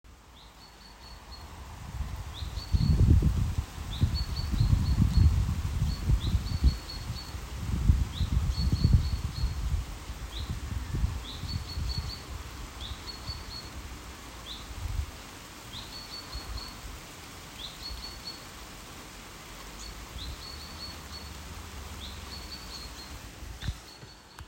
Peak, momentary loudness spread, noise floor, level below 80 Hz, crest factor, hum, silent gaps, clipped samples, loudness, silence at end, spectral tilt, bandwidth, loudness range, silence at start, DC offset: -10 dBFS; 18 LU; -52 dBFS; -34 dBFS; 22 dB; none; none; under 0.1%; -33 LUFS; 0 s; -5.5 dB/octave; 16 kHz; 13 LU; 0.05 s; under 0.1%